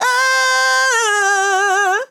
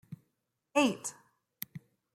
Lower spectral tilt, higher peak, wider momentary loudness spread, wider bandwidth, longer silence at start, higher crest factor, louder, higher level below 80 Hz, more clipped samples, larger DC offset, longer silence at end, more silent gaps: second, 2.5 dB/octave vs -3.5 dB/octave; first, -6 dBFS vs -12 dBFS; second, 1 LU vs 23 LU; first, 18.5 kHz vs 16.5 kHz; about the same, 0 s vs 0.1 s; second, 10 dB vs 24 dB; first, -13 LUFS vs -33 LUFS; second, under -90 dBFS vs -82 dBFS; neither; neither; second, 0.05 s vs 0.35 s; neither